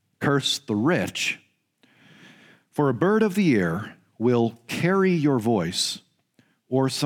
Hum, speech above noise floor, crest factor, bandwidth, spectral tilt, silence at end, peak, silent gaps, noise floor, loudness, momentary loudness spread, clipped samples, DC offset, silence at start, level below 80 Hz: none; 42 dB; 16 dB; 17.5 kHz; -5 dB/octave; 0 s; -8 dBFS; none; -64 dBFS; -23 LUFS; 7 LU; under 0.1%; under 0.1%; 0.2 s; -64 dBFS